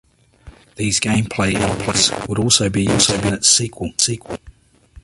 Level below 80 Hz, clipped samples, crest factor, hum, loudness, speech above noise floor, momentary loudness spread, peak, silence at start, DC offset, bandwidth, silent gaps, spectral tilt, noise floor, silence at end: -40 dBFS; under 0.1%; 20 dB; none; -16 LUFS; 28 dB; 11 LU; 0 dBFS; 0.45 s; under 0.1%; 12 kHz; none; -3 dB/octave; -46 dBFS; 0.05 s